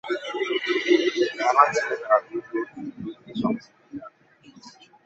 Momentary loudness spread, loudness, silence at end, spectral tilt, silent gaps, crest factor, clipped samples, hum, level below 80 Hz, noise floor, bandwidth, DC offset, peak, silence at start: 19 LU; -24 LUFS; 0.35 s; -4 dB/octave; none; 24 dB; under 0.1%; none; -70 dBFS; -53 dBFS; 8 kHz; under 0.1%; -2 dBFS; 0.05 s